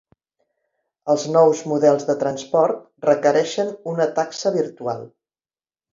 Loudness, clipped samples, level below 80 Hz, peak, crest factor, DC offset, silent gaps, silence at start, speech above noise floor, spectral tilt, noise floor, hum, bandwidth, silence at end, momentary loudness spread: -20 LUFS; under 0.1%; -70 dBFS; -2 dBFS; 18 dB; under 0.1%; none; 1.05 s; over 71 dB; -5 dB/octave; under -90 dBFS; none; 7.6 kHz; 0.85 s; 9 LU